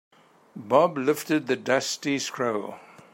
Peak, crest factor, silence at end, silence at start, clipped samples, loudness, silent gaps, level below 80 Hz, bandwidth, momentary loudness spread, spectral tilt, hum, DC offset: -6 dBFS; 20 dB; 0.3 s; 0.55 s; under 0.1%; -25 LUFS; none; -76 dBFS; 16.5 kHz; 15 LU; -4 dB/octave; none; under 0.1%